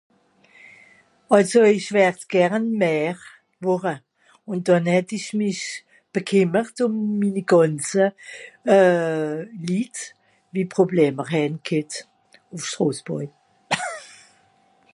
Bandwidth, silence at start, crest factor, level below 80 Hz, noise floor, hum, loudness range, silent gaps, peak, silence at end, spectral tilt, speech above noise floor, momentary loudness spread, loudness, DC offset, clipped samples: 11.5 kHz; 1.3 s; 20 dB; -72 dBFS; -60 dBFS; none; 5 LU; none; -2 dBFS; 0.9 s; -5.5 dB/octave; 39 dB; 15 LU; -21 LUFS; under 0.1%; under 0.1%